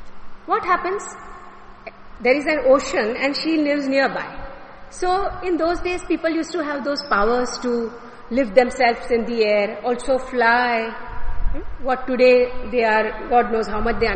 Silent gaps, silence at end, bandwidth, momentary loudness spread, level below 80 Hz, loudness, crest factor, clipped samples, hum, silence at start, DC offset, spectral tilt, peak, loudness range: none; 0 s; 8.8 kHz; 17 LU; -34 dBFS; -20 LUFS; 18 dB; under 0.1%; none; 0 s; under 0.1%; -4.5 dB/octave; -2 dBFS; 3 LU